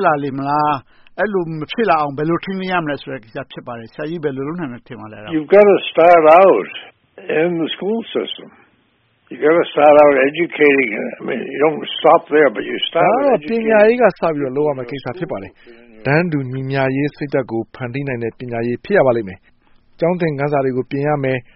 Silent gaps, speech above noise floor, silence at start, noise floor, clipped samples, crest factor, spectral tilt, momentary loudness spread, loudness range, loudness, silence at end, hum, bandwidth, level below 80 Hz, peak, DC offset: none; 44 dB; 0 s; -59 dBFS; under 0.1%; 16 dB; -4.5 dB/octave; 17 LU; 7 LU; -16 LUFS; 0.15 s; none; 5.8 kHz; -54 dBFS; 0 dBFS; under 0.1%